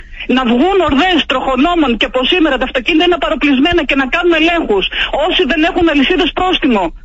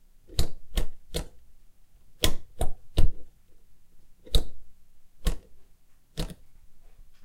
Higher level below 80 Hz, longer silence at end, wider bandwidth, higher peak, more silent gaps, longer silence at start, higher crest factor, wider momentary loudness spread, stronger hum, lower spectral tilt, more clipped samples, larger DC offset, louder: about the same, -30 dBFS vs -32 dBFS; about the same, 0.05 s vs 0.15 s; second, 8 kHz vs 16 kHz; about the same, -2 dBFS vs -4 dBFS; neither; second, 0 s vs 0.3 s; second, 12 dB vs 20 dB; second, 3 LU vs 15 LU; neither; second, -1.5 dB/octave vs -4 dB/octave; neither; neither; first, -12 LUFS vs -34 LUFS